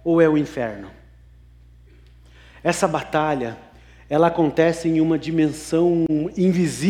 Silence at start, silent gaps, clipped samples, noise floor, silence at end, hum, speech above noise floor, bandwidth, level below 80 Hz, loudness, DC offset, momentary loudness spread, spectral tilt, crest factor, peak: 0.05 s; none; under 0.1%; -48 dBFS; 0 s; 60 Hz at -50 dBFS; 29 dB; 14 kHz; -50 dBFS; -20 LUFS; under 0.1%; 9 LU; -6.5 dB/octave; 18 dB; -4 dBFS